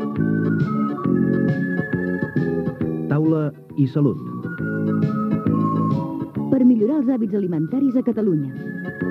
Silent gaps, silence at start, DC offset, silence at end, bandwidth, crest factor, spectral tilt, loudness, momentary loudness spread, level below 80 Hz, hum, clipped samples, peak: none; 0 s; under 0.1%; 0 s; 5.6 kHz; 14 dB; -10.5 dB/octave; -21 LUFS; 8 LU; -56 dBFS; none; under 0.1%; -6 dBFS